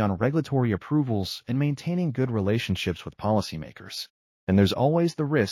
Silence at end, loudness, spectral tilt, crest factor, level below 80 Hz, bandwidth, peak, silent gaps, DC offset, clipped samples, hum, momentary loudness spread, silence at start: 0 s; -26 LUFS; -7 dB/octave; 16 dB; -54 dBFS; 14 kHz; -10 dBFS; 4.10-4.47 s; under 0.1%; under 0.1%; none; 14 LU; 0 s